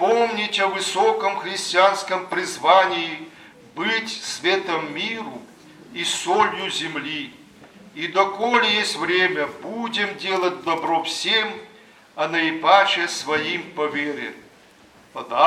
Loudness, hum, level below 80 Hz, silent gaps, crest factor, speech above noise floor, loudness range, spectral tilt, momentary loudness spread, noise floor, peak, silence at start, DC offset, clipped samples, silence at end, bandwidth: -21 LUFS; none; -70 dBFS; none; 22 dB; 29 dB; 4 LU; -2.5 dB/octave; 14 LU; -51 dBFS; 0 dBFS; 0 s; under 0.1%; under 0.1%; 0 s; 14.5 kHz